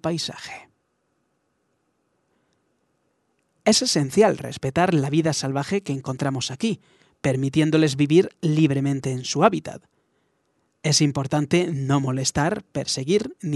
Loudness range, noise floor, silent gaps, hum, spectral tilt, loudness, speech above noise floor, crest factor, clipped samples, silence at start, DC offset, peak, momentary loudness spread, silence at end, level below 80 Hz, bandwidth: 3 LU; -71 dBFS; none; none; -5 dB/octave; -22 LUFS; 50 dB; 22 dB; under 0.1%; 0.05 s; under 0.1%; -2 dBFS; 9 LU; 0 s; -58 dBFS; 12 kHz